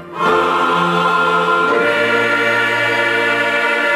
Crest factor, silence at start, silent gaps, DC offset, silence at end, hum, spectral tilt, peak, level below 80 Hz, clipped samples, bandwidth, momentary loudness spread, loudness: 12 dB; 0 s; none; under 0.1%; 0 s; none; -4 dB/octave; -4 dBFS; -60 dBFS; under 0.1%; 15.5 kHz; 1 LU; -14 LUFS